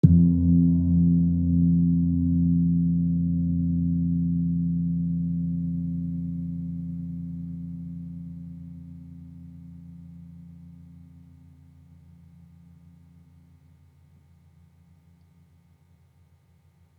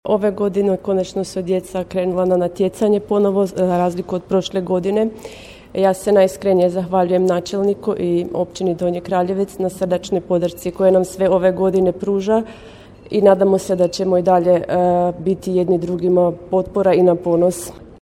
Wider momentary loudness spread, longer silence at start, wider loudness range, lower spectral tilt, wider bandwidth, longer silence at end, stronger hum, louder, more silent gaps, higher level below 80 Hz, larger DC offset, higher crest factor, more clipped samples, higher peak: first, 24 LU vs 7 LU; about the same, 0.05 s vs 0.05 s; first, 24 LU vs 3 LU; first, -13.5 dB/octave vs -7 dB/octave; second, 1 kHz vs 15 kHz; first, 6.15 s vs 0.1 s; neither; second, -24 LUFS vs -17 LUFS; neither; about the same, -48 dBFS vs -48 dBFS; neither; first, 24 dB vs 16 dB; neither; about the same, -2 dBFS vs 0 dBFS